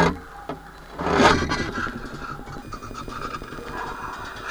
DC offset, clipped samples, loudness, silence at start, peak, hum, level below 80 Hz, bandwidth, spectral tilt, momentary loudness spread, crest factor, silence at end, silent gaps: under 0.1%; under 0.1%; -25 LUFS; 0 s; -4 dBFS; none; -40 dBFS; over 20 kHz; -4.5 dB/octave; 18 LU; 22 dB; 0 s; none